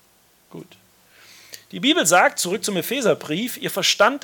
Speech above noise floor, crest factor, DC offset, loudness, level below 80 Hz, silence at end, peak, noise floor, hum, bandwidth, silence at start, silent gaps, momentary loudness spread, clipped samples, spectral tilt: 37 dB; 18 dB; under 0.1%; -19 LUFS; -72 dBFS; 0.05 s; -4 dBFS; -58 dBFS; none; 18 kHz; 0.55 s; none; 15 LU; under 0.1%; -2.5 dB/octave